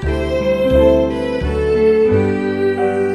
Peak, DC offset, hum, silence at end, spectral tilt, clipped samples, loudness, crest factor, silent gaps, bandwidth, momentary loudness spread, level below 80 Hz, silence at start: 0 dBFS; under 0.1%; none; 0 s; -7.5 dB/octave; under 0.1%; -15 LUFS; 14 dB; none; 12 kHz; 6 LU; -26 dBFS; 0 s